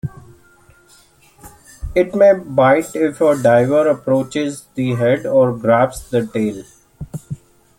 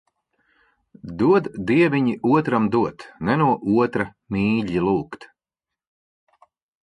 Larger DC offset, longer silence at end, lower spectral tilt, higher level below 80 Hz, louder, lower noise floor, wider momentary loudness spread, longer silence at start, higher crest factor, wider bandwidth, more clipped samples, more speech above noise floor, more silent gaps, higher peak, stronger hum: neither; second, 0.45 s vs 1.6 s; second, -6.5 dB/octave vs -8.5 dB/octave; first, -42 dBFS vs -52 dBFS; first, -16 LUFS vs -21 LUFS; second, -50 dBFS vs -87 dBFS; first, 20 LU vs 10 LU; second, 0.05 s vs 1.05 s; about the same, 16 dB vs 16 dB; first, 16.5 kHz vs 10.5 kHz; neither; second, 35 dB vs 67 dB; neither; first, -2 dBFS vs -6 dBFS; neither